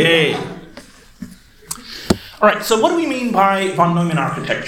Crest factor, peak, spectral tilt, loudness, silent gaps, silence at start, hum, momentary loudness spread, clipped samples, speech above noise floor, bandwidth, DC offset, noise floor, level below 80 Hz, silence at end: 18 dB; 0 dBFS; -4.5 dB/octave; -16 LUFS; none; 0 s; none; 21 LU; under 0.1%; 25 dB; 17 kHz; under 0.1%; -41 dBFS; -48 dBFS; 0 s